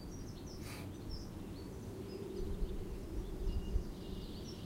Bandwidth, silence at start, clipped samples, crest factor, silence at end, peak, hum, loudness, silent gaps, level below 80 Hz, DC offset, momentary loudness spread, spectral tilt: 16 kHz; 0 s; under 0.1%; 18 dB; 0 s; -24 dBFS; none; -46 LUFS; none; -44 dBFS; under 0.1%; 5 LU; -6 dB/octave